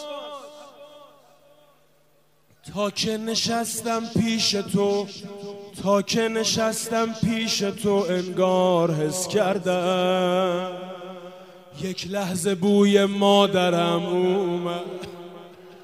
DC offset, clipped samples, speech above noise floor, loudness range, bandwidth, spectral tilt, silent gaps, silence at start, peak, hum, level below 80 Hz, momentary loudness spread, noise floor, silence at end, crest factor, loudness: under 0.1%; under 0.1%; 40 dB; 6 LU; 15.5 kHz; -4.5 dB/octave; none; 0 s; -4 dBFS; none; -60 dBFS; 18 LU; -63 dBFS; 0 s; 20 dB; -22 LUFS